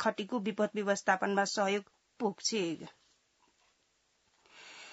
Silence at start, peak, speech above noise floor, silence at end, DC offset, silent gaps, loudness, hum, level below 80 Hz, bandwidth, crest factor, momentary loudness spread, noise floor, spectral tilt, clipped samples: 0 s; -14 dBFS; 42 dB; 0 s; under 0.1%; none; -33 LUFS; none; -84 dBFS; 7.6 kHz; 22 dB; 20 LU; -75 dBFS; -3 dB/octave; under 0.1%